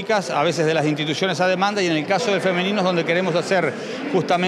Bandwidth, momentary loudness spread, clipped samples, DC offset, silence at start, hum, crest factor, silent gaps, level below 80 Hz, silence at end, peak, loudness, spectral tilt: 13 kHz; 2 LU; under 0.1%; under 0.1%; 0 s; none; 14 dB; none; -72 dBFS; 0 s; -6 dBFS; -20 LUFS; -5 dB/octave